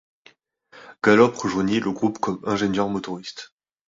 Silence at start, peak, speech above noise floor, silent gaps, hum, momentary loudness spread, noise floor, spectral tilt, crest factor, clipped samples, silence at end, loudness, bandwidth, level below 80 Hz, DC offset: 0.75 s; -2 dBFS; 35 dB; none; none; 16 LU; -57 dBFS; -5.5 dB/octave; 20 dB; under 0.1%; 0.45 s; -22 LUFS; 7.8 kHz; -58 dBFS; under 0.1%